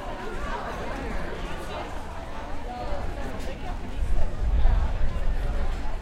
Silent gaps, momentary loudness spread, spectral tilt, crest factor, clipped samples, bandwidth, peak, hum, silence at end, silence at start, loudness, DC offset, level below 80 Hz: none; 9 LU; -6 dB/octave; 16 dB; under 0.1%; 9.2 kHz; -8 dBFS; none; 0 s; 0 s; -32 LUFS; under 0.1%; -28 dBFS